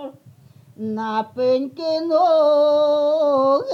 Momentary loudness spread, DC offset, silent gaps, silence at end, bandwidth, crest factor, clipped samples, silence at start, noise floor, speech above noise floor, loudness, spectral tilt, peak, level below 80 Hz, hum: 12 LU; under 0.1%; none; 0 s; 6.8 kHz; 12 dB; under 0.1%; 0 s; -48 dBFS; 30 dB; -18 LUFS; -6 dB/octave; -8 dBFS; -78 dBFS; none